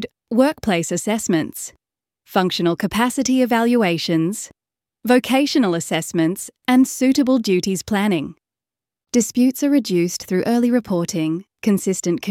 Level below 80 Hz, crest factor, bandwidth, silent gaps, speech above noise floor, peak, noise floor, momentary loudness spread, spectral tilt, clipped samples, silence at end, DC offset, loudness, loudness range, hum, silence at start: -56 dBFS; 16 dB; 16.5 kHz; none; 71 dB; -2 dBFS; -89 dBFS; 7 LU; -4.5 dB/octave; under 0.1%; 0 s; under 0.1%; -19 LUFS; 2 LU; none; 0 s